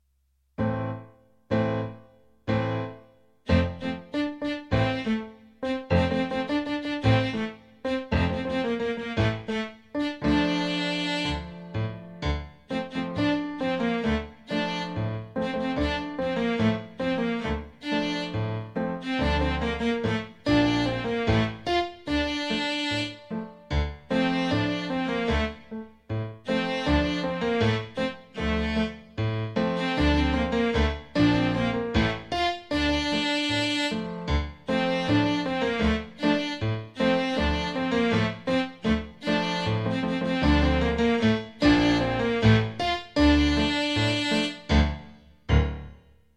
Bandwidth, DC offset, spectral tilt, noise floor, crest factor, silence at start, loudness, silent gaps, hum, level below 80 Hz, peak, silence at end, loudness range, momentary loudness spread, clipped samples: 11 kHz; under 0.1%; -6 dB/octave; -69 dBFS; 18 dB; 0.6 s; -26 LUFS; none; none; -36 dBFS; -8 dBFS; 0.45 s; 6 LU; 9 LU; under 0.1%